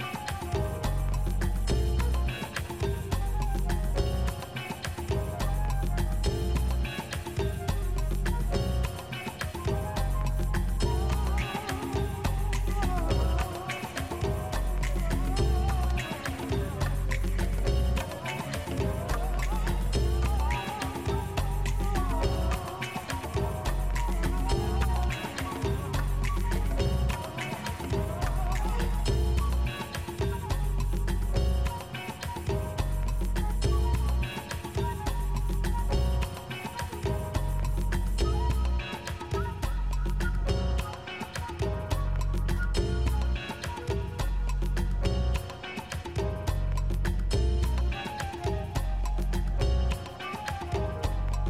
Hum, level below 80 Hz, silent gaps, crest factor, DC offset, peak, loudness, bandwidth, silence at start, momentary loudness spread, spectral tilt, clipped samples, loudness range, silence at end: none; -30 dBFS; none; 14 dB; 0.2%; -14 dBFS; -31 LUFS; 16 kHz; 0 s; 6 LU; -5.5 dB/octave; under 0.1%; 2 LU; 0 s